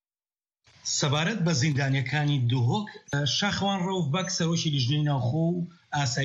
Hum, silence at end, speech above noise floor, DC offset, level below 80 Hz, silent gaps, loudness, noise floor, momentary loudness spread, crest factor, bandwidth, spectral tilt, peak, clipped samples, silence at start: none; 0 s; over 64 dB; under 0.1%; -60 dBFS; none; -26 LUFS; under -90 dBFS; 5 LU; 14 dB; 8 kHz; -4.5 dB/octave; -12 dBFS; under 0.1%; 0.85 s